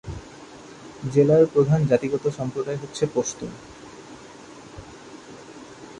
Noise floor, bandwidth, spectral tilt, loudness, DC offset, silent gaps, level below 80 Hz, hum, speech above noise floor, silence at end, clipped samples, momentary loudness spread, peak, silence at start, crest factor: -43 dBFS; 11 kHz; -6.5 dB/octave; -22 LUFS; under 0.1%; none; -52 dBFS; none; 22 dB; 0 s; under 0.1%; 25 LU; -6 dBFS; 0.05 s; 20 dB